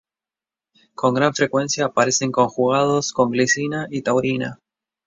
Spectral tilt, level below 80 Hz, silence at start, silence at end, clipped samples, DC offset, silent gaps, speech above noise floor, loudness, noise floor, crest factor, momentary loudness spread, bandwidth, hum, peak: -4 dB/octave; -60 dBFS; 1 s; 0.5 s; under 0.1%; under 0.1%; none; over 71 dB; -19 LUFS; under -90 dBFS; 18 dB; 6 LU; 7.8 kHz; none; -2 dBFS